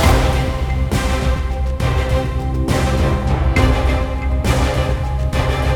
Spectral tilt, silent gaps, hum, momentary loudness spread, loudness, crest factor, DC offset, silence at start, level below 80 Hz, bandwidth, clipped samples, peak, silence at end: -6 dB/octave; none; none; 5 LU; -18 LUFS; 16 dB; under 0.1%; 0 s; -18 dBFS; 16.5 kHz; under 0.1%; 0 dBFS; 0 s